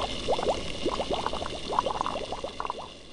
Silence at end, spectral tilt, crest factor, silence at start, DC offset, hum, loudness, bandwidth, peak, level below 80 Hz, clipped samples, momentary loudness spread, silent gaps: 0 s; -4 dB/octave; 20 dB; 0 s; 0.8%; none; -31 LUFS; 10.5 kHz; -10 dBFS; -46 dBFS; under 0.1%; 7 LU; none